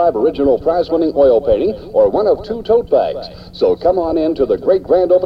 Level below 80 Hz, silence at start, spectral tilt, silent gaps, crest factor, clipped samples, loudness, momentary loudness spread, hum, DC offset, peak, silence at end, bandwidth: -38 dBFS; 0 s; -8.5 dB/octave; none; 12 dB; under 0.1%; -14 LUFS; 5 LU; none; under 0.1%; -2 dBFS; 0 s; 5.6 kHz